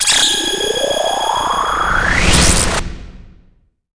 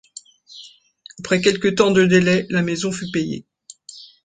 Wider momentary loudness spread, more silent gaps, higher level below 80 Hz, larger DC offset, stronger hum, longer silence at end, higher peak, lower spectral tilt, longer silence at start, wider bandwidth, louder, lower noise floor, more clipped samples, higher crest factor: second, 6 LU vs 25 LU; neither; first, -24 dBFS vs -54 dBFS; first, 0.3% vs under 0.1%; neither; first, 0.65 s vs 0.2 s; about the same, 0 dBFS vs -2 dBFS; second, -2 dB/octave vs -5 dB/octave; second, 0 s vs 0.5 s; first, 10.5 kHz vs 9.4 kHz; first, -13 LUFS vs -18 LUFS; first, -52 dBFS vs -47 dBFS; neither; about the same, 14 dB vs 18 dB